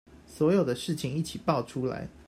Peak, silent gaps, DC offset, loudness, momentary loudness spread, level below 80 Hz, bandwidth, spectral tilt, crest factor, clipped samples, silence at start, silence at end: -12 dBFS; none; under 0.1%; -29 LUFS; 8 LU; -58 dBFS; 16 kHz; -6.5 dB/octave; 18 dB; under 0.1%; 0.1 s; 0.05 s